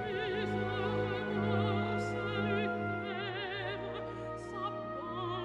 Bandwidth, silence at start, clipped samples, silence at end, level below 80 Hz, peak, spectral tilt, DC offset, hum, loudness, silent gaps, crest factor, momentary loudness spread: 9.6 kHz; 0 s; under 0.1%; 0 s; -60 dBFS; -20 dBFS; -7 dB/octave; under 0.1%; none; -36 LUFS; none; 16 dB; 8 LU